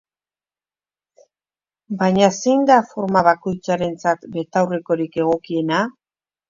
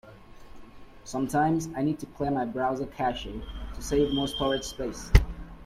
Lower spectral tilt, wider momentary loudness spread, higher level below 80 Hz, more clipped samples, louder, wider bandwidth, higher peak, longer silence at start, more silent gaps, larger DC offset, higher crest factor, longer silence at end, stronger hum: about the same, -5.5 dB/octave vs -5.5 dB/octave; second, 7 LU vs 14 LU; second, -58 dBFS vs -34 dBFS; neither; first, -19 LUFS vs -28 LUFS; second, 7.6 kHz vs 15 kHz; about the same, 0 dBFS vs -2 dBFS; first, 1.9 s vs 0.05 s; neither; neither; second, 20 dB vs 26 dB; first, 0.6 s vs 0 s; neither